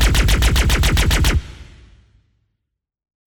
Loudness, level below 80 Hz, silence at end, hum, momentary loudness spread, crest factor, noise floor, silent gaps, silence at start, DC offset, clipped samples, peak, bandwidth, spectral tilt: -16 LUFS; -20 dBFS; 1.65 s; none; 6 LU; 14 dB; -77 dBFS; none; 0 s; under 0.1%; under 0.1%; -4 dBFS; 19 kHz; -4 dB/octave